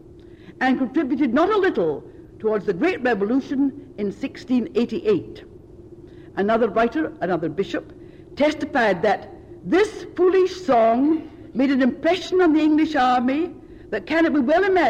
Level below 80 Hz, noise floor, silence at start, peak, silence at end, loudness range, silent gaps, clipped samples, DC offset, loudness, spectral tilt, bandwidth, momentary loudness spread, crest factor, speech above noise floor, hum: -52 dBFS; -44 dBFS; 0.15 s; -10 dBFS; 0 s; 5 LU; none; under 0.1%; under 0.1%; -21 LUFS; -6 dB/octave; 9 kHz; 11 LU; 12 dB; 24 dB; none